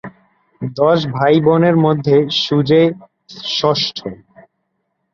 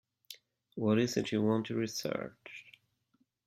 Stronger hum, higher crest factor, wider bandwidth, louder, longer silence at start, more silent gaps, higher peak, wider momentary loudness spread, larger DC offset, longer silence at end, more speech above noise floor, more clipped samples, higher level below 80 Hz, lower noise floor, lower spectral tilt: neither; about the same, 14 dB vs 18 dB; second, 7.2 kHz vs 14.5 kHz; first, -14 LUFS vs -33 LUFS; second, 0.05 s vs 0.3 s; neither; first, 0 dBFS vs -18 dBFS; second, 16 LU vs 21 LU; neither; first, 1 s vs 0.75 s; first, 56 dB vs 44 dB; neither; first, -56 dBFS vs -72 dBFS; second, -70 dBFS vs -76 dBFS; about the same, -6.5 dB/octave vs -5.5 dB/octave